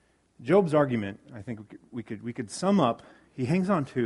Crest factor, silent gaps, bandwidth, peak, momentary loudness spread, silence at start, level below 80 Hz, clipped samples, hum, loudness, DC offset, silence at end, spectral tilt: 20 dB; none; 11.5 kHz; -8 dBFS; 18 LU; 0.4 s; -64 dBFS; under 0.1%; none; -27 LUFS; under 0.1%; 0 s; -7 dB/octave